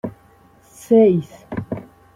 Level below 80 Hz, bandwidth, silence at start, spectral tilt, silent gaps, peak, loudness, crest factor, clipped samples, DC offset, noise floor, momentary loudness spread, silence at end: -54 dBFS; 14 kHz; 0.05 s; -8.5 dB/octave; none; -4 dBFS; -17 LUFS; 16 dB; under 0.1%; under 0.1%; -51 dBFS; 18 LU; 0.35 s